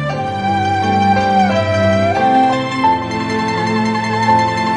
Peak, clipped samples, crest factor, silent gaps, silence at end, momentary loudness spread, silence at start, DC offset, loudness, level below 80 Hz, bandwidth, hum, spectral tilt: -2 dBFS; under 0.1%; 12 dB; none; 0 s; 5 LU; 0 s; under 0.1%; -14 LUFS; -48 dBFS; 11 kHz; none; -6 dB/octave